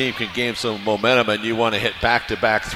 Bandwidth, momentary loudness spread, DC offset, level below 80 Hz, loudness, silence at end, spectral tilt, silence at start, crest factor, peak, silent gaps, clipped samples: 16 kHz; 5 LU; under 0.1%; -44 dBFS; -20 LUFS; 0 s; -4 dB/octave; 0 s; 18 dB; -2 dBFS; none; under 0.1%